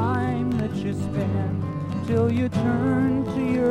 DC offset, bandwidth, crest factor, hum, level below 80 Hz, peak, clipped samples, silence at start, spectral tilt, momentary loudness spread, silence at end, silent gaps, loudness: under 0.1%; 11 kHz; 14 dB; none; -48 dBFS; -10 dBFS; under 0.1%; 0 s; -8.5 dB/octave; 6 LU; 0 s; none; -24 LUFS